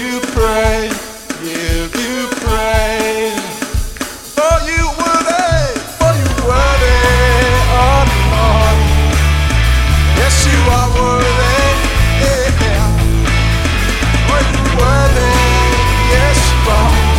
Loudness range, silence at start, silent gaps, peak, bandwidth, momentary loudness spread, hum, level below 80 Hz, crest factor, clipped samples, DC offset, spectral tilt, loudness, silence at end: 5 LU; 0 s; none; 0 dBFS; 16.5 kHz; 7 LU; none; -14 dBFS; 12 dB; under 0.1%; under 0.1%; -4.5 dB/octave; -12 LUFS; 0 s